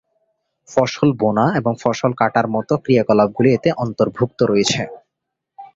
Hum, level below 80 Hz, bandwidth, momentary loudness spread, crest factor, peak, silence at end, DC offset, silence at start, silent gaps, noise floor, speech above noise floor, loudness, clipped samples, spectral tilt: none; -54 dBFS; 7.8 kHz; 5 LU; 16 dB; -2 dBFS; 0.1 s; under 0.1%; 0.7 s; none; -80 dBFS; 63 dB; -17 LUFS; under 0.1%; -6 dB/octave